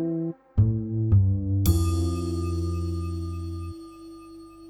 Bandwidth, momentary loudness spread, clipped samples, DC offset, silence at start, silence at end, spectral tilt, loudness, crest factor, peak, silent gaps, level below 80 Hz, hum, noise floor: 18 kHz; 21 LU; under 0.1%; under 0.1%; 0 s; 0 s; -7.5 dB/octave; -26 LUFS; 16 dB; -10 dBFS; none; -36 dBFS; 50 Hz at -50 dBFS; -45 dBFS